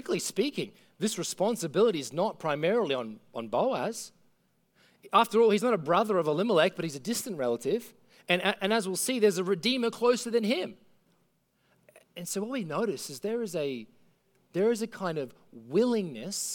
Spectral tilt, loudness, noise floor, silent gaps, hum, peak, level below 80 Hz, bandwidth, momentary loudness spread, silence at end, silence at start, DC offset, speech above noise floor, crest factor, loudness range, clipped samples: -4 dB/octave; -29 LUFS; -72 dBFS; none; none; -10 dBFS; -78 dBFS; 19 kHz; 10 LU; 0 s; 0.05 s; under 0.1%; 43 dB; 20 dB; 7 LU; under 0.1%